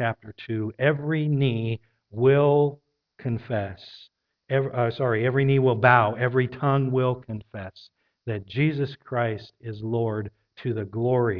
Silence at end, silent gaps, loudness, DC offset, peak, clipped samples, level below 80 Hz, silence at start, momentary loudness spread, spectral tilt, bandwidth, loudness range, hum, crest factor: 0 s; none; -24 LUFS; under 0.1%; -2 dBFS; under 0.1%; -60 dBFS; 0 s; 17 LU; -10 dB/octave; 5.4 kHz; 7 LU; none; 22 dB